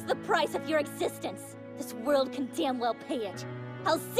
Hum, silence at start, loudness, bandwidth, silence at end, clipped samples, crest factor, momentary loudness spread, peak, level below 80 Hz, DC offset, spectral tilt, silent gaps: none; 0 s; -31 LUFS; 15.5 kHz; 0 s; under 0.1%; 18 dB; 12 LU; -12 dBFS; -70 dBFS; under 0.1%; -4.5 dB/octave; none